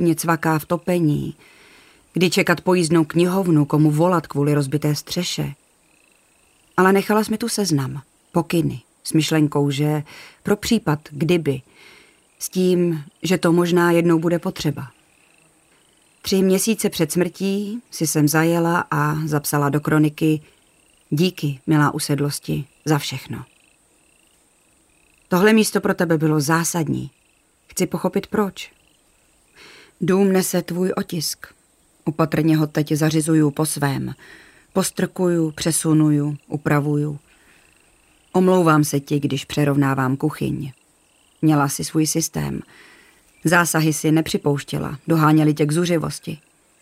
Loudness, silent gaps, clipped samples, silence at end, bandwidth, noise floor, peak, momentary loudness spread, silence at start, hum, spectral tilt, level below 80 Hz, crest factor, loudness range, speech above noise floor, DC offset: -20 LUFS; none; under 0.1%; 0.45 s; 16 kHz; -60 dBFS; -2 dBFS; 11 LU; 0 s; none; -5.5 dB/octave; -54 dBFS; 18 dB; 4 LU; 41 dB; under 0.1%